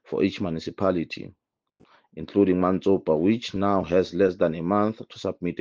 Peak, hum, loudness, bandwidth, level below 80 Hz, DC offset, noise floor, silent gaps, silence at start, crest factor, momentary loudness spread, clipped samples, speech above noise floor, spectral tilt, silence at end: -8 dBFS; none; -24 LUFS; 7.2 kHz; -58 dBFS; under 0.1%; -62 dBFS; none; 0.1 s; 18 dB; 11 LU; under 0.1%; 38 dB; -7.5 dB/octave; 0.05 s